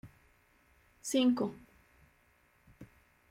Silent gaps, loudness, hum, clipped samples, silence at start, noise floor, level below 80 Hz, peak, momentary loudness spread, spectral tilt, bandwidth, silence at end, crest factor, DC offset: none; -32 LUFS; none; under 0.1%; 0.05 s; -69 dBFS; -70 dBFS; -18 dBFS; 28 LU; -4 dB/octave; 16 kHz; 0.45 s; 20 dB; under 0.1%